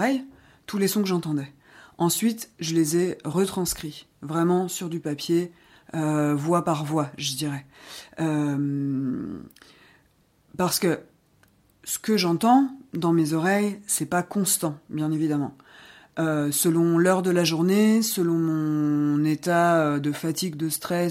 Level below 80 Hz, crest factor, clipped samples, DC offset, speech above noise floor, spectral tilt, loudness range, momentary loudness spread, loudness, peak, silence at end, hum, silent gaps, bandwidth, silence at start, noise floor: -62 dBFS; 16 dB; under 0.1%; under 0.1%; 39 dB; -5 dB/octave; 7 LU; 11 LU; -24 LUFS; -8 dBFS; 0 s; none; none; 16 kHz; 0 s; -63 dBFS